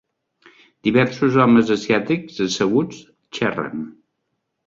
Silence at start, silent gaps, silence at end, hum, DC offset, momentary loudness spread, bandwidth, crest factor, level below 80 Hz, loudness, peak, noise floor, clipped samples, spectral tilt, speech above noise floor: 0.85 s; none; 0.75 s; none; under 0.1%; 15 LU; 7.6 kHz; 18 dB; -58 dBFS; -19 LUFS; -2 dBFS; -75 dBFS; under 0.1%; -6 dB/octave; 57 dB